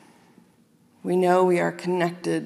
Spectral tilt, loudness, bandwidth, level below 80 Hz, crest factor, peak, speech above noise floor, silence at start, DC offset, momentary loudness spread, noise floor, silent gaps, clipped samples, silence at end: -6.5 dB/octave; -22 LUFS; 12.5 kHz; -80 dBFS; 16 dB; -8 dBFS; 37 dB; 1.05 s; under 0.1%; 7 LU; -59 dBFS; none; under 0.1%; 0 s